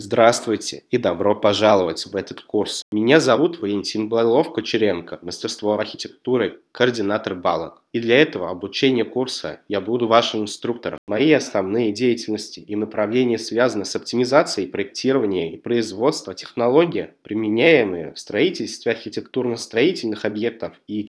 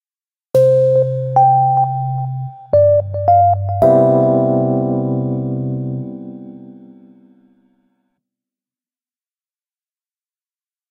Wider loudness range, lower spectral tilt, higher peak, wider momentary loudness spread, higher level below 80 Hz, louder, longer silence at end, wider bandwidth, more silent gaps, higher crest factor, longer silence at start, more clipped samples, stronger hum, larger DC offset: second, 3 LU vs 14 LU; second, -4.5 dB/octave vs -10.5 dB/octave; about the same, 0 dBFS vs 0 dBFS; second, 11 LU vs 14 LU; second, -64 dBFS vs -54 dBFS; second, -20 LUFS vs -14 LUFS; second, 0.1 s vs 4.2 s; about the same, 11 kHz vs 11 kHz; first, 2.82-2.92 s, 10.98-11.07 s vs none; about the same, 20 dB vs 16 dB; second, 0 s vs 0.55 s; neither; neither; neither